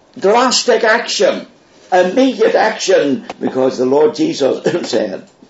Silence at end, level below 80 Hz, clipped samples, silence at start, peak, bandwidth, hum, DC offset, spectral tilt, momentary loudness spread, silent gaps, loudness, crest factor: 0.3 s; -66 dBFS; under 0.1%; 0.15 s; 0 dBFS; 8 kHz; none; under 0.1%; -3.5 dB/octave; 7 LU; none; -14 LUFS; 14 dB